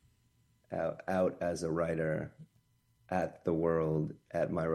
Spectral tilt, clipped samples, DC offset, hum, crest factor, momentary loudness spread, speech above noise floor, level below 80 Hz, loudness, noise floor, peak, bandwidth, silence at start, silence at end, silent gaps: -7.5 dB/octave; under 0.1%; under 0.1%; none; 16 dB; 7 LU; 38 dB; -62 dBFS; -34 LUFS; -71 dBFS; -18 dBFS; 12.5 kHz; 0.7 s; 0 s; none